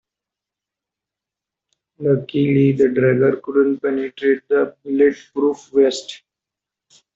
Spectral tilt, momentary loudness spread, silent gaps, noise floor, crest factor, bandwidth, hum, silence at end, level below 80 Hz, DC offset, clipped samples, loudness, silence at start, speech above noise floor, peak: -7 dB/octave; 7 LU; none; -86 dBFS; 16 dB; 7.8 kHz; none; 1 s; -62 dBFS; under 0.1%; under 0.1%; -18 LUFS; 2 s; 69 dB; -4 dBFS